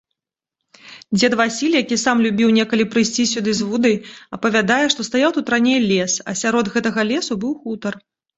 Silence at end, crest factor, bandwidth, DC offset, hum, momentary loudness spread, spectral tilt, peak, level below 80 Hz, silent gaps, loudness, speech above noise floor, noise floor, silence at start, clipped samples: 0.4 s; 18 dB; 8.2 kHz; under 0.1%; none; 9 LU; -3.5 dB/octave; 0 dBFS; -58 dBFS; none; -18 LUFS; 65 dB; -82 dBFS; 0.85 s; under 0.1%